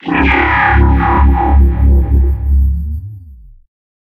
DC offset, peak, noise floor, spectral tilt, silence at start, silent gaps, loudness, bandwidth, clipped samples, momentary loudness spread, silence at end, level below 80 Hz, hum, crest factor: under 0.1%; 0 dBFS; -36 dBFS; -9 dB/octave; 0.05 s; none; -11 LUFS; 4.2 kHz; under 0.1%; 10 LU; 0.75 s; -12 dBFS; none; 10 dB